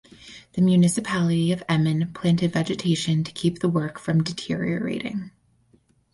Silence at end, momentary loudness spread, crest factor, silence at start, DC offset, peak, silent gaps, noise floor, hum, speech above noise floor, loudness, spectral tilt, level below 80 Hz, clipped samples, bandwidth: 0.85 s; 11 LU; 14 dB; 0.25 s; under 0.1%; -8 dBFS; none; -62 dBFS; none; 39 dB; -23 LUFS; -6 dB/octave; -58 dBFS; under 0.1%; 11.5 kHz